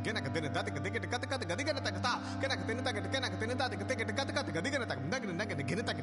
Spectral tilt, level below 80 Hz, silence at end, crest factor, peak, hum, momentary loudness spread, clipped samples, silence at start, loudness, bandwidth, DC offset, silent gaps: -4.5 dB/octave; -56 dBFS; 0 s; 16 dB; -20 dBFS; none; 2 LU; under 0.1%; 0 s; -35 LUFS; 11.5 kHz; under 0.1%; none